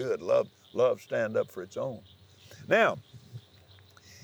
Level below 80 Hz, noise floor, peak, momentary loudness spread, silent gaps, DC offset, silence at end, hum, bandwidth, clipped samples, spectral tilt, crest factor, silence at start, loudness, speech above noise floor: -78 dBFS; -57 dBFS; -12 dBFS; 24 LU; none; under 0.1%; 0.85 s; none; over 20 kHz; under 0.1%; -5.5 dB/octave; 20 dB; 0 s; -29 LUFS; 28 dB